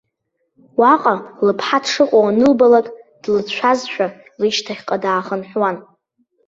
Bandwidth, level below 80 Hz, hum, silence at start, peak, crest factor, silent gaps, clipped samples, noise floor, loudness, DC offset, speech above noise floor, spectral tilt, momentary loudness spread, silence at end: 7.8 kHz; -60 dBFS; none; 0.8 s; -2 dBFS; 16 dB; none; under 0.1%; -71 dBFS; -16 LUFS; under 0.1%; 56 dB; -4.5 dB/octave; 11 LU; 0.65 s